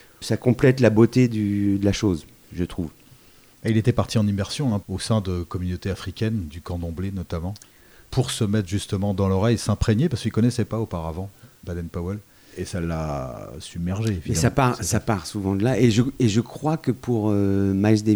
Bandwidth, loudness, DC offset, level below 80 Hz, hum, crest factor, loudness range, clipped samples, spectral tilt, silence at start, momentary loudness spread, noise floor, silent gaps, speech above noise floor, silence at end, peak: over 20 kHz; -23 LUFS; under 0.1%; -42 dBFS; none; 18 dB; 6 LU; under 0.1%; -6.5 dB/octave; 0.2 s; 13 LU; -52 dBFS; none; 30 dB; 0 s; -4 dBFS